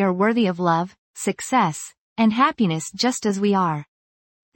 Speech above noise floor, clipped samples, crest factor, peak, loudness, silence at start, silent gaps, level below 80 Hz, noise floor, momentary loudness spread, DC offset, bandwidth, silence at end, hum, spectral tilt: over 69 dB; under 0.1%; 16 dB; -4 dBFS; -21 LUFS; 0 s; 0.98-1.14 s, 1.98-2.16 s; -64 dBFS; under -90 dBFS; 10 LU; under 0.1%; 17 kHz; 0.75 s; none; -5 dB/octave